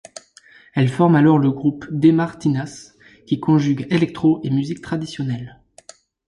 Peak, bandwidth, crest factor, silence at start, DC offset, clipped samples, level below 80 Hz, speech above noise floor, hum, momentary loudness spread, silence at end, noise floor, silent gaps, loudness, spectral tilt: -2 dBFS; 11 kHz; 16 dB; 0.75 s; under 0.1%; under 0.1%; -56 dBFS; 31 dB; none; 13 LU; 0.8 s; -49 dBFS; none; -19 LUFS; -7.5 dB/octave